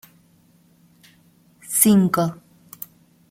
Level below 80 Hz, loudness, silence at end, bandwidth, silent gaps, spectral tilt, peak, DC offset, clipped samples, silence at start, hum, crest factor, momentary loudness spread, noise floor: -62 dBFS; -18 LUFS; 0.95 s; 16.5 kHz; none; -5 dB/octave; 0 dBFS; under 0.1%; under 0.1%; 1.7 s; none; 22 dB; 23 LU; -57 dBFS